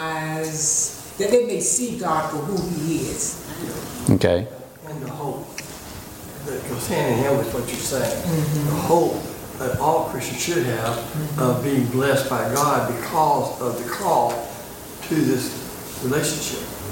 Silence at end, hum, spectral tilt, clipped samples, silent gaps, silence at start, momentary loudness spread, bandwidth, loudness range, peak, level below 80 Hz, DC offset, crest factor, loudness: 0 s; none; -4.5 dB/octave; under 0.1%; none; 0 s; 13 LU; 17 kHz; 4 LU; -2 dBFS; -48 dBFS; under 0.1%; 20 dB; -22 LUFS